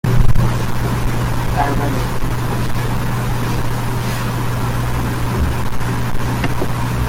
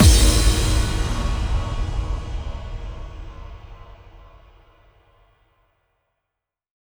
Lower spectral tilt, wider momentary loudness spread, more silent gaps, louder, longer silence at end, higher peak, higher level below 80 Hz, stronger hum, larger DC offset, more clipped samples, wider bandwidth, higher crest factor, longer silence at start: first, -6 dB/octave vs -4 dB/octave; second, 3 LU vs 24 LU; neither; first, -19 LUFS vs -22 LUFS; second, 0 s vs 2.65 s; about the same, 0 dBFS vs -2 dBFS; about the same, -22 dBFS vs -24 dBFS; neither; neither; neither; second, 16.5 kHz vs over 20 kHz; second, 14 dB vs 20 dB; about the same, 0.05 s vs 0 s